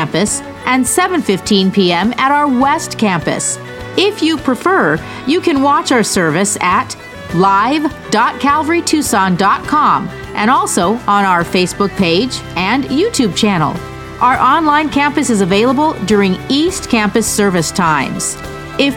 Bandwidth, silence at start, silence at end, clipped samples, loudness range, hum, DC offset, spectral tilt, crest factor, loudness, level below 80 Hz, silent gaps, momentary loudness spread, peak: 17 kHz; 0 s; 0 s; under 0.1%; 1 LU; none; under 0.1%; -4 dB/octave; 12 dB; -13 LUFS; -40 dBFS; none; 6 LU; 0 dBFS